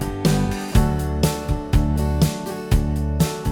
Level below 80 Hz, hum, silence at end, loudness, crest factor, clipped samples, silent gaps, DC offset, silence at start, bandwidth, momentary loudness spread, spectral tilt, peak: -24 dBFS; none; 0 s; -21 LUFS; 16 dB; under 0.1%; none; under 0.1%; 0 s; 19.5 kHz; 3 LU; -6 dB/octave; -2 dBFS